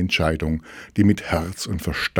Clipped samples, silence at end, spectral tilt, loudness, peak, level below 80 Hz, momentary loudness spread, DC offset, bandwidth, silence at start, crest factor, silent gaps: under 0.1%; 0 s; -5.5 dB/octave; -23 LUFS; -4 dBFS; -40 dBFS; 9 LU; under 0.1%; 18 kHz; 0 s; 18 dB; none